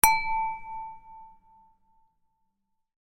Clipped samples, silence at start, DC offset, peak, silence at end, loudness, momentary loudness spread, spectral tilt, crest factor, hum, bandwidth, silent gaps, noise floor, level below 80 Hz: under 0.1%; 0.05 s; under 0.1%; 0 dBFS; 1.75 s; -28 LUFS; 25 LU; 0 dB/octave; 30 dB; none; 16.5 kHz; none; -77 dBFS; -50 dBFS